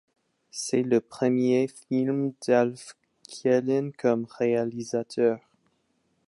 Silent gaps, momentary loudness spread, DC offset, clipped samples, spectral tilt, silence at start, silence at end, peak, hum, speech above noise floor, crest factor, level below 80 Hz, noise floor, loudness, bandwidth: none; 11 LU; under 0.1%; under 0.1%; -6 dB/octave; 0.55 s; 0.9 s; -10 dBFS; none; 46 dB; 18 dB; -76 dBFS; -71 dBFS; -26 LUFS; 11.5 kHz